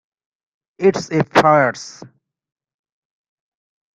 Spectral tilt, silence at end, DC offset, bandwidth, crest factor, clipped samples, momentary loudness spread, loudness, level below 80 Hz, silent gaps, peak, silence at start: -5.5 dB/octave; 1.9 s; under 0.1%; 11 kHz; 20 dB; under 0.1%; 16 LU; -16 LUFS; -60 dBFS; none; 0 dBFS; 0.8 s